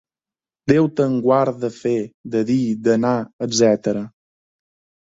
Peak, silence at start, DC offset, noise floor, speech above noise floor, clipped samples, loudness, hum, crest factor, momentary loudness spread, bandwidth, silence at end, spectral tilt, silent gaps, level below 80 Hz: -2 dBFS; 0.65 s; under 0.1%; under -90 dBFS; over 72 dB; under 0.1%; -19 LUFS; none; 18 dB; 8 LU; 8 kHz; 1.05 s; -5.5 dB/octave; 2.14-2.24 s, 3.33-3.39 s; -58 dBFS